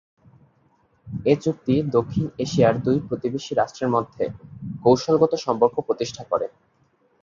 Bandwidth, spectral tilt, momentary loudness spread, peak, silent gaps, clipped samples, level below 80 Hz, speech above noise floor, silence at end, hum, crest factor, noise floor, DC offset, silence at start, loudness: 7.4 kHz; -6.5 dB/octave; 10 LU; -4 dBFS; none; under 0.1%; -54 dBFS; 42 dB; 0.75 s; none; 20 dB; -63 dBFS; under 0.1%; 1.05 s; -22 LUFS